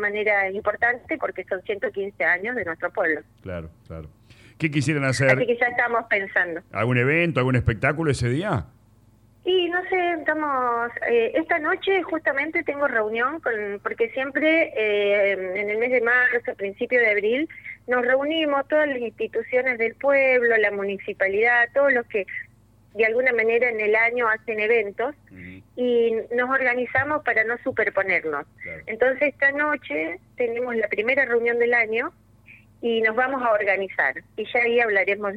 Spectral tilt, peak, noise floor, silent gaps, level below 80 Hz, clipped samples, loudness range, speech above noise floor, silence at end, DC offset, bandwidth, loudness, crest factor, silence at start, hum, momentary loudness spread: -6 dB/octave; -6 dBFS; -55 dBFS; none; -54 dBFS; under 0.1%; 3 LU; 33 dB; 0 s; under 0.1%; 11.5 kHz; -22 LUFS; 16 dB; 0 s; none; 10 LU